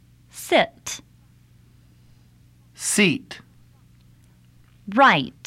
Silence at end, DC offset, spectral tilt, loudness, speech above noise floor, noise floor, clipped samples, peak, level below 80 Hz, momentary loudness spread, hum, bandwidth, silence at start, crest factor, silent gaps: 0.15 s; under 0.1%; -3 dB/octave; -20 LUFS; 34 dB; -54 dBFS; under 0.1%; -4 dBFS; -60 dBFS; 25 LU; none; 16 kHz; 0.35 s; 20 dB; none